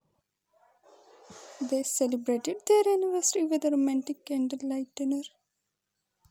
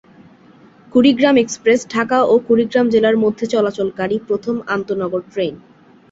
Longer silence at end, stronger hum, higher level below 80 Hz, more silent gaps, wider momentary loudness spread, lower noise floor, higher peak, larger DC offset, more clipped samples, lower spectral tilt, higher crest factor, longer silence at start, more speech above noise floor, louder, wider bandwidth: first, 1.05 s vs 0.55 s; neither; second, -88 dBFS vs -56 dBFS; neither; about the same, 10 LU vs 8 LU; first, -83 dBFS vs -46 dBFS; second, -12 dBFS vs -2 dBFS; neither; neither; second, -2.5 dB/octave vs -5 dB/octave; about the same, 18 dB vs 16 dB; first, 1.3 s vs 0.95 s; first, 55 dB vs 31 dB; second, -28 LUFS vs -16 LUFS; first, 17 kHz vs 8 kHz